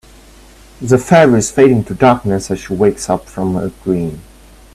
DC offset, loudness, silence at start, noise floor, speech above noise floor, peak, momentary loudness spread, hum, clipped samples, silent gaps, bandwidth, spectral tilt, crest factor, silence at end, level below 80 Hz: under 0.1%; -13 LUFS; 0.8 s; -41 dBFS; 28 dB; 0 dBFS; 11 LU; none; under 0.1%; none; 14 kHz; -6 dB/octave; 14 dB; 0.55 s; -40 dBFS